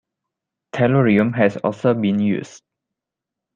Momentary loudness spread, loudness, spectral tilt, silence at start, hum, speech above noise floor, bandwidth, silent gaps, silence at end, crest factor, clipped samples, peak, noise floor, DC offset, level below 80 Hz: 11 LU; -18 LUFS; -8 dB/octave; 0.75 s; none; 67 dB; 7.4 kHz; none; 1 s; 18 dB; under 0.1%; -2 dBFS; -85 dBFS; under 0.1%; -60 dBFS